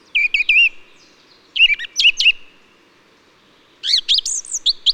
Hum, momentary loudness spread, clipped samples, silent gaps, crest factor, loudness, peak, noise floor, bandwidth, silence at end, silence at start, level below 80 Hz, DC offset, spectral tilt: none; 10 LU; under 0.1%; none; 16 dB; -14 LUFS; -4 dBFS; -53 dBFS; 14 kHz; 0 s; 0.15 s; -52 dBFS; under 0.1%; 4.5 dB/octave